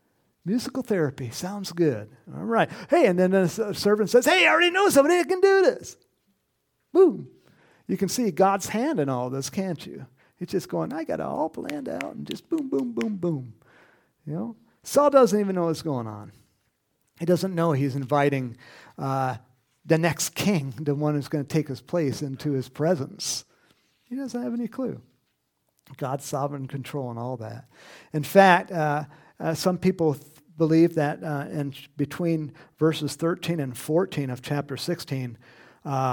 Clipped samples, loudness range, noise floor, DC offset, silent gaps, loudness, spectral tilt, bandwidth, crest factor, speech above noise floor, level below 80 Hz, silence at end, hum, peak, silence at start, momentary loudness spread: under 0.1%; 10 LU; -74 dBFS; under 0.1%; none; -25 LUFS; -5.5 dB/octave; 19 kHz; 24 dB; 50 dB; -66 dBFS; 0 s; none; -2 dBFS; 0.45 s; 16 LU